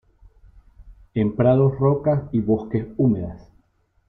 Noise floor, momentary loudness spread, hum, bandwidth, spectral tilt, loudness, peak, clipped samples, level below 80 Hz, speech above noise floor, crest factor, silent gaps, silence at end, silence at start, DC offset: -64 dBFS; 10 LU; none; 3.9 kHz; -12.5 dB/octave; -21 LUFS; -6 dBFS; under 0.1%; -48 dBFS; 44 dB; 16 dB; none; 0.7 s; 0.8 s; under 0.1%